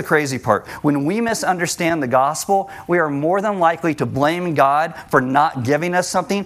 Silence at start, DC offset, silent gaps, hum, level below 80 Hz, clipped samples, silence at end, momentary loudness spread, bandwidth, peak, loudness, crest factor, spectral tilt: 0 s; under 0.1%; none; none; -56 dBFS; under 0.1%; 0 s; 4 LU; 16 kHz; 0 dBFS; -18 LUFS; 18 dB; -5 dB/octave